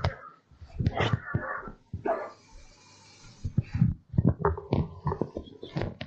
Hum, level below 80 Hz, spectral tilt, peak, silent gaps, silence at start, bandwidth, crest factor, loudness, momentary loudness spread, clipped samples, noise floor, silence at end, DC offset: none; -44 dBFS; -8 dB/octave; -8 dBFS; none; 0 s; 7.8 kHz; 22 dB; -31 LUFS; 16 LU; under 0.1%; -55 dBFS; 0 s; under 0.1%